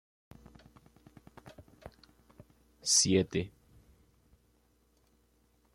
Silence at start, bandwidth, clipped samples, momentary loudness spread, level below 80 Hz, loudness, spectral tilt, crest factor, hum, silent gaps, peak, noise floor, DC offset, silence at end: 1.45 s; 15.5 kHz; under 0.1%; 30 LU; -66 dBFS; -28 LUFS; -3 dB/octave; 24 dB; none; none; -14 dBFS; -70 dBFS; under 0.1%; 2.25 s